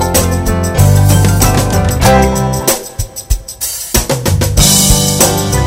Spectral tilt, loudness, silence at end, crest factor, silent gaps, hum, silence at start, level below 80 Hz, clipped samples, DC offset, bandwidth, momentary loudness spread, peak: -4 dB/octave; -10 LUFS; 0 s; 10 dB; none; none; 0 s; -18 dBFS; 0.4%; under 0.1%; 16.5 kHz; 11 LU; 0 dBFS